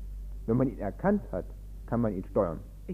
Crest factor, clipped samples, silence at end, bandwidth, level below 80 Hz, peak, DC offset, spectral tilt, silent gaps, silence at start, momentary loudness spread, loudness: 18 dB; under 0.1%; 0 s; 15 kHz; -42 dBFS; -12 dBFS; under 0.1%; -10.5 dB/octave; none; 0 s; 14 LU; -31 LUFS